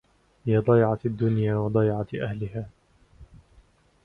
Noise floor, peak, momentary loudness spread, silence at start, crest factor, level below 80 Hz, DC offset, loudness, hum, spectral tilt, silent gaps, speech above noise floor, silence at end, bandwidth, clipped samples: -58 dBFS; -8 dBFS; 14 LU; 0.45 s; 18 dB; -52 dBFS; under 0.1%; -25 LUFS; none; -10.5 dB/octave; none; 35 dB; 0.8 s; 4.2 kHz; under 0.1%